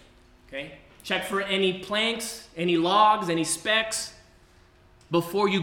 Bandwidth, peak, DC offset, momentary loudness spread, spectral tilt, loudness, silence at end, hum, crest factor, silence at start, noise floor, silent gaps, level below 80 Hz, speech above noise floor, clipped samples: 18 kHz; -8 dBFS; under 0.1%; 17 LU; -3.5 dB/octave; -25 LUFS; 0 s; none; 18 dB; 0.5 s; -56 dBFS; none; -60 dBFS; 31 dB; under 0.1%